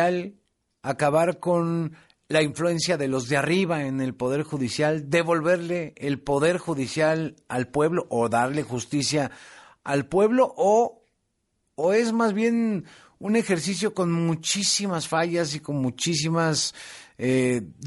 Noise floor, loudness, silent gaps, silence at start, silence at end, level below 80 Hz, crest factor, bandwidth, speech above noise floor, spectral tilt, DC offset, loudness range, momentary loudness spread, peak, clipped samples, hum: -75 dBFS; -24 LUFS; none; 0 s; 0 s; -60 dBFS; 16 dB; 11.5 kHz; 51 dB; -4.5 dB/octave; under 0.1%; 2 LU; 8 LU; -8 dBFS; under 0.1%; none